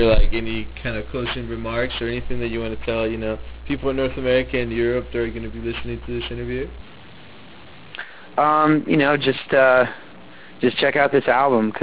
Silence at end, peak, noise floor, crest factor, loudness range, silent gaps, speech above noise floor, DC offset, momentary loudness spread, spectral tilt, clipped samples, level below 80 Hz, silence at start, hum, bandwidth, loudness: 0 s; -4 dBFS; -43 dBFS; 16 dB; 9 LU; none; 24 dB; under 0.1%; 12 LU; -9.5 dB/octave; under 0.1%; -32 dBFS; 0 s; none; 4 kHz; -21 LUFS